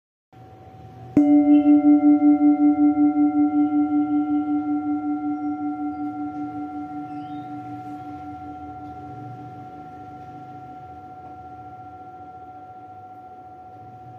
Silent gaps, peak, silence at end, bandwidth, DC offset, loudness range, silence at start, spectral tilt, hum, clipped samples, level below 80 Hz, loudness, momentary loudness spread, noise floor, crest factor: none; -4 dBFS; 0 s; 3.2 kHz; under 0.1%; 23 LU; 0.4 s; -9.5 dB/octave; none; under 0.1%; -64 dBFS; -20 LUFS; 26 LU; -44 dBFS; 18 dB